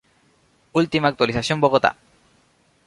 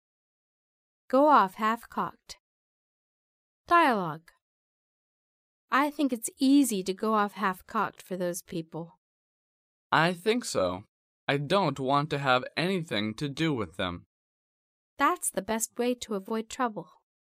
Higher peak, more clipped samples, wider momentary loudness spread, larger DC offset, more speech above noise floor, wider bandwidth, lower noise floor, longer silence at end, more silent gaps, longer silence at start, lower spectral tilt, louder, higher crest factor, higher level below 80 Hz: first, -2 dBFS vs -8 dBFS; neither; second, 5 LU vs 14 LU; neither; second, 41 dB vs over 62 dB; second, 11.5 kHz vs 15.5 kHz; second, -61 dBFS vs under -90 dBFS; first, 0.95 s vs 0.4 s; second, none vs 2.39-3.64 s, 4.42-5.68 s, 8.97-9.90 s, 10.88-11.27 s, 14.06-14.97 s; second, 0.75 s vs 1.15 s; about the same, -5.5 dB/octave vs -4.5 dB/octave; first, -20 LUFS vs -28 LUFS; about the same, 20 dB vs 20 dB; first, -52 dBFS vs -66 dBFS